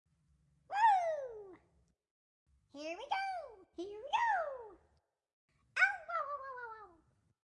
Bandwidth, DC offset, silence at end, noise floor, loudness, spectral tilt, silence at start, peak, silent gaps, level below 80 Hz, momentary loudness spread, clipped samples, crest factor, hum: 11 kHz; under 0.1%; 0.6 s; -77 dBFS; -36 LUFS; -2 dB/octave; 0.7 s; -18 dBFS; 2.11-2.46 s, 5.33-5.48 s; -78 dBFS; 20 LU; under 0.1%; 22 dB; none